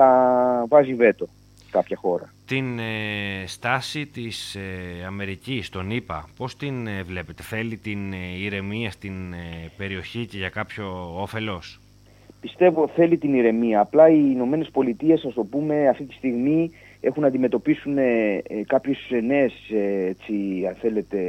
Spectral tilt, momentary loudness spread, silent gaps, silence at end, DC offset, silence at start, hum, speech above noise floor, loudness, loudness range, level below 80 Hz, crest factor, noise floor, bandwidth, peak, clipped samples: -7 dB/octave; 14 LU; none; 0 s; under 0.1%; 0 s; 50 Hz at -50 dBFS; 28 dB; -23 LUFS; 11 LU; -54 dBFS; 20 dB; -51 dBFS; 14.5 kHz; -2 dBFS; under 0.1%